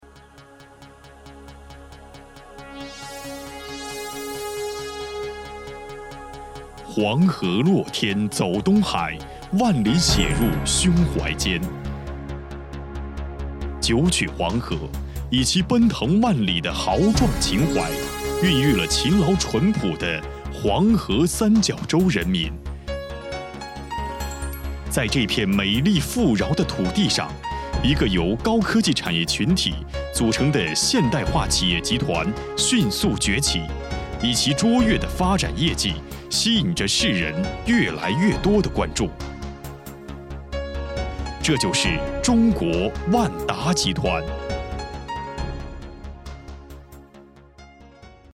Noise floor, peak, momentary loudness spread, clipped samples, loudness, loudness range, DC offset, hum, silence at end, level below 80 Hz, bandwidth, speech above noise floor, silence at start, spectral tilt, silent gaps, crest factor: -47 dBFS; -4 dBFS; 16 LU; under 0.1%; -21 LUFS; 12 LU; under 0.1%; none; 0.25 s; -34 dBFS; 17 kHz; 27 dB; 0.15 s; -4.5 dB/octave; none; 20 dB